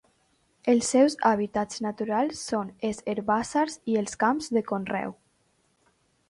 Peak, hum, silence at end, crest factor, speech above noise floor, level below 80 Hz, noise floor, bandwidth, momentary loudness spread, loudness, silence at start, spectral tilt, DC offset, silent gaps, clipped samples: -8 dBFS; none; 1.15 s; 18 dB; 43 dB; -64 dBFS; -69 dBFS; 11.5 kHz; 10 LU; -26 LUFS; 0.65 s; -4.5 dB/octave; under 0.1%; none; under 0.1%